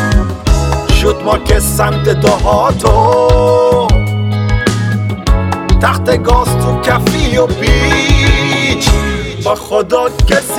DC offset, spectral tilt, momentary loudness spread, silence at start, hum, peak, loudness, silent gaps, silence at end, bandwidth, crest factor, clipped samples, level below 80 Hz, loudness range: under 0.1%; -5 dB/octave; 5 LU; 0 s; none; 0 dBFS; -11 LUFS; none; 0 s; 16.5 kHz; 10 dB; 0.9%; -16 dBFS; 2 LU